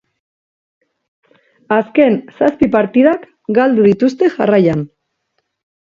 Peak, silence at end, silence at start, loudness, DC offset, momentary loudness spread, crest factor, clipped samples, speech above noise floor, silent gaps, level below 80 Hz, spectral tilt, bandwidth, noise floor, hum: 0 dBFS; 1.1 s; 1.7 s; -13 LUFS; under 0.1%; 6 LU; 14 dB; under 0.1%; 57 dB; none; -52 dBFS; -8 dB/octave; 7.2 kHz; -69 dBFS; none